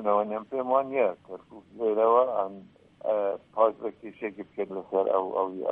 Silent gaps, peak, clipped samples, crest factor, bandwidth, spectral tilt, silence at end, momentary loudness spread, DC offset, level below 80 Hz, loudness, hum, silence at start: none; -10 dBFS; under 0.1%; 18 dB; 3.8 kHz; -8.5 dB/octave; 0 s; 14 LU; under 0.1%; -74 dBFS; -28 LUFS; none; 0 s